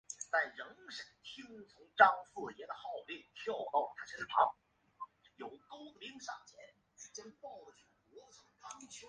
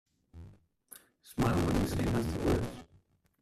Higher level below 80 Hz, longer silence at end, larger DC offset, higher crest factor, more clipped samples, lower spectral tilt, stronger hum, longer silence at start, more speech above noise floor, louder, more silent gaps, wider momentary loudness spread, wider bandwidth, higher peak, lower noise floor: second, -82 dBFS vs -46 dBFS; second, 0 s vs 0.6 s; neither; first, 30 dB vs 18 dB; neither; second, -1.5 dB/octave vs -6.5 dB/octave; neither; second, 0.1 s vs 0.35 s; second, 23 dB vs 36 dB; second, -36 LUFS vs -32 LUFS; neither; about the same, 22 LU vs 24 LU; second, 10 kHz vs 14.5 kHz; first, -10 dBFS vs -16 dBFS; second, -61 dBFS vs -67 dBFS